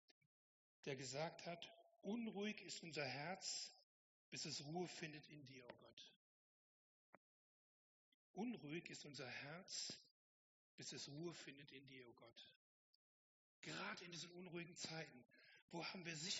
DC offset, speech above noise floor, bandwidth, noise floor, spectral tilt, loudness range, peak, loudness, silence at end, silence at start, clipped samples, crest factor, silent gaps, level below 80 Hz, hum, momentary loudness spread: under 0.1%; over 37 dB; 7.6 kHz; under -90 dBFS; -3 dB/octave; 8 LU; -34 dBFS; -52 LUFS; 0 s; 0.85 s; under 0.1%; 22 dB; 3.83-4.32 s, 5.93-5.97 s, 6.16-8.34 s, 10.11-10.78 s, 12.56-13.63 s, 15.62-15.68 s; under -90 dBFS; none; 14 LU